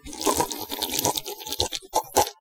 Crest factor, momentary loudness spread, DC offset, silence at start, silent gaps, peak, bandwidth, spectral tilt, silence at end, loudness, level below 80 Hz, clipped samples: 26 dB; 5 LU; under 0.1%; 0.05 s; none; 0 dBFS; 19 kHz; -2 dB/octave; 0.1 s; -26 LUFS; -50 dBFS; under 0.1%